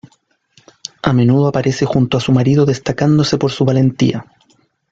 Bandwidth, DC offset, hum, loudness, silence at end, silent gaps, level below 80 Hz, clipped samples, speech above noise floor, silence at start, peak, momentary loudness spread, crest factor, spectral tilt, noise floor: 7.8 kHz; under 0.1%; none; -14 LUFS; 0.7 s; none; -46 dBFS; under 0.1%; 44 dB; 1.05 s; -2 dBFS; 6 LU; 14 dB; -7 dB/octave; -57 dBFS